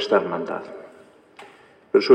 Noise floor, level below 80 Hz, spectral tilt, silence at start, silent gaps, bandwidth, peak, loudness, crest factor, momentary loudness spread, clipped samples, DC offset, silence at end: -50 dBFS; -78 dBFS; -5.5 dB/octave; 0 s; none; 9 kHz; -2 dBFS; -24 LUFS; 20 dB; 25 LU; under 0.1%; under 0.1%; 0 s